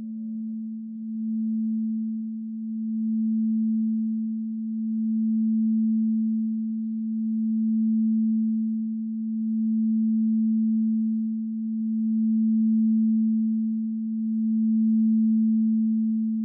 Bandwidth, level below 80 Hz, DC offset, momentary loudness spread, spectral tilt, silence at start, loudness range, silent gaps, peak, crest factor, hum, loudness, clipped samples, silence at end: 0.3 kHz; under -90 dBFS; under 0.1%; 8 LU; -17.5 dB/octave; 0 s; 4 LU; none; -18 dBFS; 6 dB; none; -25 LUFS; under 0.1%; 0 s